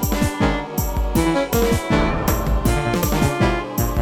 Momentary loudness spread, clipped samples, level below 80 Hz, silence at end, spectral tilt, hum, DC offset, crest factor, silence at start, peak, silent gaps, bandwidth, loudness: 4 LU; under 0.1%; -26 dBFS; 0 s; -5.5 dB/octave; none; under 0.1%; 14 dB; 0 s; -4 dBFS; none; 17.5 kHz; -20 LUFS